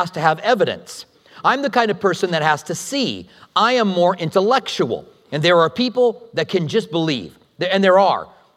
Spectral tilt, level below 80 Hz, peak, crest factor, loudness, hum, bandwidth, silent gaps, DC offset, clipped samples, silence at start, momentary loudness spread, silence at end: -4.5 dB/octave; -66 dBFS; 0 dBFS; 18 dB; -18 LUFS; none; 14.5 kHz; none; under 0.1%; under 0.1%; 0 s; 11 LU; 0.3 s